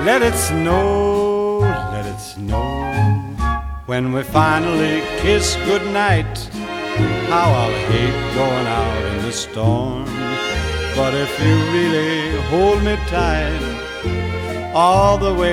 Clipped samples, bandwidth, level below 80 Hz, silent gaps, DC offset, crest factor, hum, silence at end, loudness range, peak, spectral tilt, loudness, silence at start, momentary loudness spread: under 0.1%; 16 kHz; -28 dBFS; none; under 0.1%; 16 dB; none; 0 s; 2 LU; -2 dBFS; -5.5 dB/octave; -18 LUFS; 0 s; 9 LU